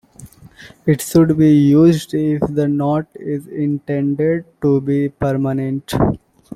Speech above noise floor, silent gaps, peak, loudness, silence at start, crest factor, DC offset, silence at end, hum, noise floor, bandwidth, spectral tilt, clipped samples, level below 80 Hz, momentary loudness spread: 26 dB; none; -2 dBFS; -16 LUFS; 0.2 s; 14 dB; under 0.1%; 0.4 s; none; -42 dBFS; 15 kHz; -7.5 dB/octave; under 0.1%; -42 dBFS; 10 LU